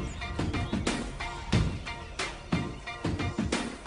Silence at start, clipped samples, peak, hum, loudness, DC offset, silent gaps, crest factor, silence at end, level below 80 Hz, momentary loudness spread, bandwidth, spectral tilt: 0 s; under 0.1%; -12 dBFS; none; -33 LUFS; under 0.1%; none; 20 dB; 0 s; -40 dBFS; 8 LU; 10.5 kHz; -5 dB/octave